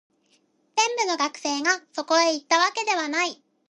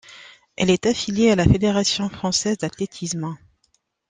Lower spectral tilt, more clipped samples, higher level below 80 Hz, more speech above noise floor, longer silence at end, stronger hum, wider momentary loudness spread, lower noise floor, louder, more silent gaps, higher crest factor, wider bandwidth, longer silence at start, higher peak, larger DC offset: second, 0.5 dB/octave vs -4.5 dB/octave; neither; second, -82 dBFS vs -42 dBFS; second, 42 dB vs 47 dB; second, 0.35 s vs 0.75 s; neither; second, 5 LU vs 12 LU; about the same, -66 dBFS vs -67 dBFS; second, -23 LUFS vs -20 LUFS; neither; about the same, 20 dB vs 20 dB; about the same, 11 kHz vs 10 kHz; first, 0.75 s vs 0.1 s; second, -6 dBFS vs -2 dBFS; neither